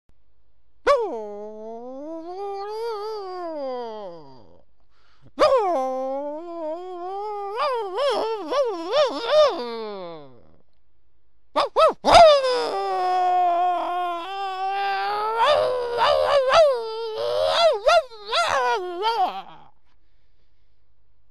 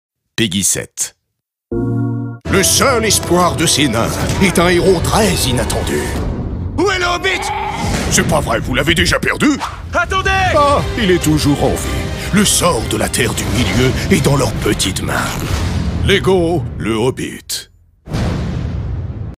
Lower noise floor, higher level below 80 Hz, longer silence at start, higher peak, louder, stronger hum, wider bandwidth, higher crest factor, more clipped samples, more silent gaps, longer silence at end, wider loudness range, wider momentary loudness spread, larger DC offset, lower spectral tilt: second, -69 dBFS vs -75 dBFS; second, -52 dBFS vs -26 dBFS; first, 0.85 s vs 0.4 s; about the same, -2 dBFS vs 0 dBFS; second, -22 LUFS vs -15 LUFS; neither; second, 12.5 kHz vs 16 kHz; first, 20 dB vs 14 dB; neither; neither; first, 1.75 s vs 0.05 s; first, 10 LU vs 4 LU; first, 16 LU vs 10 LU; first, 0.6% vs under 0.1%; about the same, -3 dB/octave vs -4 dB/octave